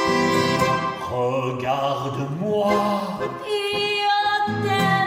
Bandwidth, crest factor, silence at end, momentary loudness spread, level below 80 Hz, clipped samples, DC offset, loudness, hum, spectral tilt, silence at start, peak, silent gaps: 16 kHz; 14 dB; 0 s; 7 LU; -54 dBFS; under 0.1%; under 0.1%; -22 LUFS; none; -5 dB/octave; 0 s; -8 dBFS; none